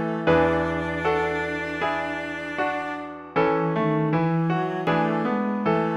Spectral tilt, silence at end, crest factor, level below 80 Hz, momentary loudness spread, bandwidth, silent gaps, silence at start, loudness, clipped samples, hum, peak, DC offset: -7.5 dB/octave; 0 s; 18 dB; -52 dBFS; 7 LU; 8.4 kHz; none; 0 s; -24 LUFS; under 0.1%; none; -6 dBFS; under 0.1%